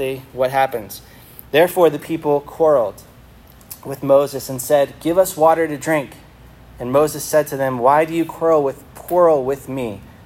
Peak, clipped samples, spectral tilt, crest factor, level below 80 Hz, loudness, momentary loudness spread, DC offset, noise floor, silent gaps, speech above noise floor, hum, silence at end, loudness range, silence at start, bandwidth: 0 dBFS; under 0.1%; -5 dB/octave; 18 dB; -50 dBFS; -17 LUFS; 14 LU; under 0.1%; -44 dBFS; none; 27 dB; none; 0.15 s; 2 LU; 0 s; 16.5 kHz